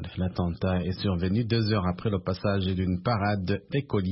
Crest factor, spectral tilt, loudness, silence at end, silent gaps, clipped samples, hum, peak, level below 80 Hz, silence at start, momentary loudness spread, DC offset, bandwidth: 14 dB; -11 dB/octave; -28 LUFS; 0 s; none; under 0.1%; none; -12 dBFS; -48 dBFS; 0 s; 4 LU; under 0.1%; 5.8 kHz